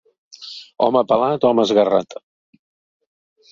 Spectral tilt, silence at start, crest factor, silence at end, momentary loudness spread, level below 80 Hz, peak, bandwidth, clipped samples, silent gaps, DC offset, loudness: -6 dB/octave; 0.4 s; 18 dB; 1.35 s; 20 LU; -62 dBFS; -2 dBFS; 7.6 kHz; under 0.1%; none; under 0.1%; -17 LUFS